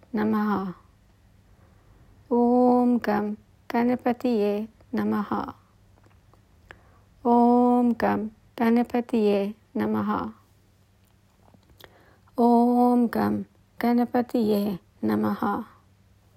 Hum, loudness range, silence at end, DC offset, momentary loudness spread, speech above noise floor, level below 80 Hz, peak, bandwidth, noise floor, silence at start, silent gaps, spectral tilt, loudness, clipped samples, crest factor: none; 5 LU; 0.7 s; under 0.1%; 13 LU; 37 dB; -60 dBFS; -8 dBFS; 15.5 kHz; -60 dBFS; 0.15 s; none; -8 dB/octave; -24 LUFS; under 0.1%; 18 dB